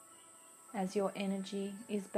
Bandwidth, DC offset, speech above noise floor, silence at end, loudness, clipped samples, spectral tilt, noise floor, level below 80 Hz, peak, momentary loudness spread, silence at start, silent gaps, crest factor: 15 kHz; under 0.1%; 21 dB; 0 s; -39 LUFS; under 0.1%; -5.5 dB/octave; -59 dBFS; -84 dBFS; -22 dBFS; 19 LU; 0 s; none; 18 dB